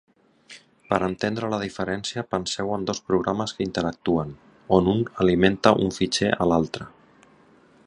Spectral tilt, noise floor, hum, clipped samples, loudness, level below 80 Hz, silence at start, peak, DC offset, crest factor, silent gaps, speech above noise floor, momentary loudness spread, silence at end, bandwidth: -5.5 dB/octave; -55 dBFS; none; under 0.1%; -24 LUFS; -48 dBFS; 0.5 s; 0 dBFS; under 0.1%; 24 dB; none; 32 dB; 8 LU; 1 s; 11 kHz